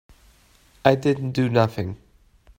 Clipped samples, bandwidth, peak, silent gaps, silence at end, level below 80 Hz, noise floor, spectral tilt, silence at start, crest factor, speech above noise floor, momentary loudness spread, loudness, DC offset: under 0.1%; 16 kHz; -2 dBFS; none; 0.6 s; -54 dBFS; -56 dBFS; -7.5 dB/octave; 0.85 s; 22 dB; 35 dB; 13 LU; -22 LUFS; under 0.1%